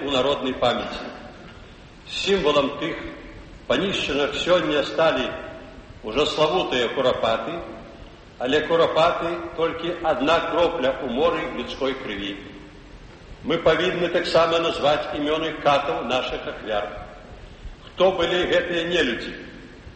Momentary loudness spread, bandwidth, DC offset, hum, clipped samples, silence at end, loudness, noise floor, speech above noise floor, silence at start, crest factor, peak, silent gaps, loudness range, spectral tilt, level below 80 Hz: 21 LU; 8.4 kHz; under 0.1%; none; under 0.1%; 0 s; -22 LUFS; -44 dBFS; 22 dB; 0 s; 16 dB; -6 dBFS; none; 4 LU; -4.5 dB/octave; -46 dBFS